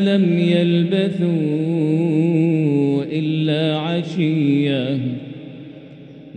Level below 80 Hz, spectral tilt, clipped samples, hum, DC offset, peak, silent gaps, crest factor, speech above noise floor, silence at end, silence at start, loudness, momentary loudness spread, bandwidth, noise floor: -64 dBFS; -8.5 dB/octave; under 0.1%; none; under 0.1%; -4 dBFS; none; 14 dB; 22 dB; 0.05 s; 0 s; -18 LUFS; 12 LU; 8.8 kHz; -39 dBFS